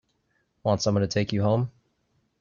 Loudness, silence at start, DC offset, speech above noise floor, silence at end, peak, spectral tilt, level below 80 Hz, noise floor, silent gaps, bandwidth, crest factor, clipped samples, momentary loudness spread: -26 LUFS; 0.65 s; under 0.1%; 48 dB; 0.7 s; -10 dBFS; -6 dB/octave; -60 dBFS; -72 dBFS; none; 7.2 kHz; 18 dB; under 0.1%; 6 LU